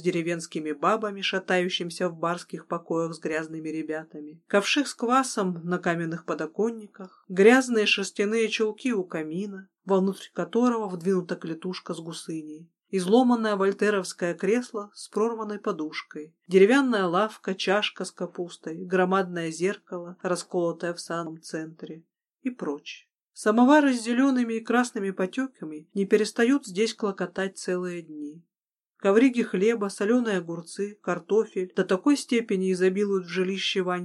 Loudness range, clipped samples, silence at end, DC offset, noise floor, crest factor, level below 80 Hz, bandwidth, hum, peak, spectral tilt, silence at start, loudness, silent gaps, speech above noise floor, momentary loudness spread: 5 LU; under 0.1%; 0 s; under 0.1%; under -90 dBFS; 20 dB; -82 dBFS; 12.5 kHz; none; -6 dBFS; -5 dB/octave; 0 s; -26 LUFS; 23.22-23.26 s; over 64 dB; 15 LU